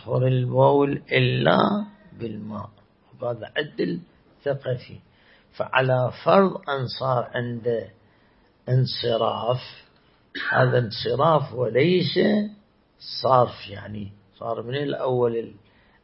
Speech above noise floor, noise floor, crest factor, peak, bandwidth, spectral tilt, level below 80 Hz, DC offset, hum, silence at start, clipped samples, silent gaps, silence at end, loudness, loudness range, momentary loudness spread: 36 dB; -59 dBFS; 22 dB; -2 dBFS; 5.8 kHz; -11 dB/octave; -60 dBFS; under 0.1%; none; 0.05 s; under 0.1%; none; 0.5 s; -23 LUFS; 6 LU; 17 LU